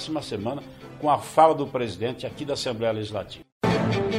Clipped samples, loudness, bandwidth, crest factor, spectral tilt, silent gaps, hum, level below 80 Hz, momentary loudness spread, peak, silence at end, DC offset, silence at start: under 0.1%; -25 LUFS; 15.5 kHz; 20 dB; -6 dB/octave; 3.52-3.61 s; none; -54 dBFS; 14 LU; -4 dBFS; 0 s; under 0.1%; 0 s